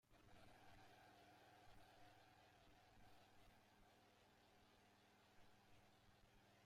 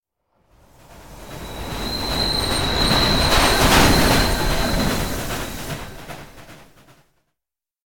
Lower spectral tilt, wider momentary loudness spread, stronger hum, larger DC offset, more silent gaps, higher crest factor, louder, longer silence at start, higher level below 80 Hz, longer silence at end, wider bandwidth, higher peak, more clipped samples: about the same, -4 dB/octave vs -3.5 dB/octave; second, 1 LU vs 21 LU; neither; second, under 0.1% vs 0.9%; neither; about the same, 16 dB vs 20 dB; second, -69 LUFS vs -18 LUFS; about the same, 0.05 s vs 0 s; second, -82 dBFS vs -28 dBFS; about the same, 0 s vs 0.05 s; second, 16 kHz vs 18 kHz; second, -56 dBFS vs -2 dBFS; neither